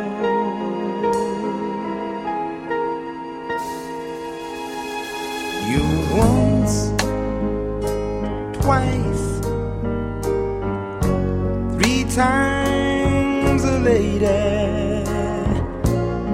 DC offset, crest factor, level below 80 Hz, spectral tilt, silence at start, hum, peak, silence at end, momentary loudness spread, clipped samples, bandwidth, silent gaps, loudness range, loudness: under 0.1%; 20 dB; -32 dBFS; -6 dB/octave; 0 s; none; -2 dBFS; 0 s; 10 LU; under 0.1%; 16 kHz; none; 8 LU; -21 LUFS